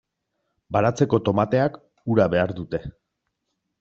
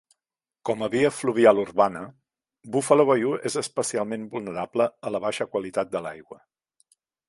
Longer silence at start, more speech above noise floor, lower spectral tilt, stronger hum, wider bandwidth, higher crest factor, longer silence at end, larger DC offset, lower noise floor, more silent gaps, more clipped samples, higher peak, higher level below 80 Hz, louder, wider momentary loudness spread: about the same, 0.7 s vs 0.65 s; second, 57 dB vs 65 dB; first, -6.5 dB/octave vs -4.5 dB/octave; neither; second, 8 kHz vs 11.5 kHz; about the same, 20 dB vs 22 dB; about the same, 0.9 s vs 0.95 s; neither; second, -78 dBFS vs -89 dBFS; neither; neither; about the same, -4 dBFS vs -2 dBFS; first, -54 dBFS vs -66 dBFS; about the same, -22 LUFS vs -24 LUFS; about the same, 11 LU vs 13 LU